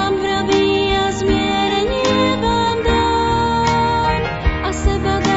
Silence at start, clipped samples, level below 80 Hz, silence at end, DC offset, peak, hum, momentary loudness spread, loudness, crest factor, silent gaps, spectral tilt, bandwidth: 0 s; under 0.1%; -26 dBFS; 0 s; 0.6%; -4 dBFS; none; 3 LU; -17 LUFS; 14 dB; none; -5 dB/octave; 8 kHz